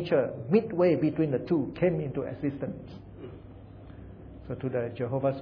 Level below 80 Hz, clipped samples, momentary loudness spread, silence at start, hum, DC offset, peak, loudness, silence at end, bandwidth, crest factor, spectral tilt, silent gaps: -54 dBFS; under 0.1%; 22 LU; 0 s; none; under 0.1%; -10 dBFS; -29 LUFS; 0 s; 5.4 kHz; 18 dB; -10.5 dB/octave; none